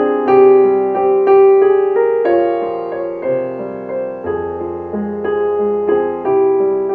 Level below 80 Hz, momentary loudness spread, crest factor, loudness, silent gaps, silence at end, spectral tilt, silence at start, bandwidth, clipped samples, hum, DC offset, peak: -50 dBFS; 13 LU; 12 dB; -14 LUFS; none; 0 s; -9.5 dB/octave; 0 s; 4.2 kHz; under 0.1%; none; under 0.1%; 0 dBFS